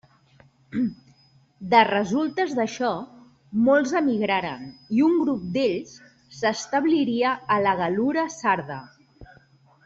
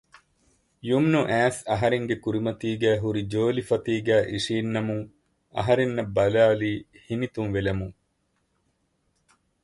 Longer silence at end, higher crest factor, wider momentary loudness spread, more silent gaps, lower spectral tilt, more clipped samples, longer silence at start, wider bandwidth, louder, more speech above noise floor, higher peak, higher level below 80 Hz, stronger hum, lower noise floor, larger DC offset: second, 0.6 s vs 1.7 s; about the same, 20 dB vs 18 dB; first, 14 LU vs 11 LU; neither; second, -5 dB/octave vs -6.5 dB/octave; neither; second, 0.7 s vs 0.85 s; second, 7.8 kHz vs 11.5 kHz; about the same, -23 LUFS vs -25 LUFS; second, 35 dB vs 48 dB; first, -4 dBFS vs -8 dBFS; second, -62 dBFS vs -52 dBFS; neither; second, -58 dBFS vs -72 dBFS; neither